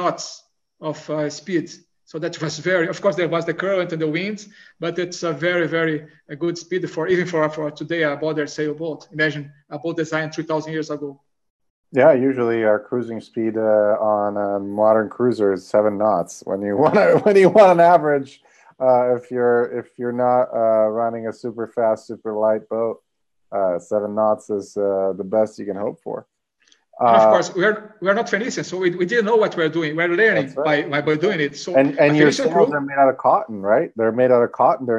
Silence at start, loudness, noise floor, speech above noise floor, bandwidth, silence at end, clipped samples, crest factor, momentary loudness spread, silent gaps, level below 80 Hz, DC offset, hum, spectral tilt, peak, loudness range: 0 s; -19 LUFS; -60 dBFS; 42 dB; 10 kHz; 0 s; under 0.1%; 18 dB; 13 LU; 11.50-11.59 s, 11.70-11.83 s; -68 dBFS; under 0.1%; none; -5.5 dB/octave; 0 dBFS; 8 LU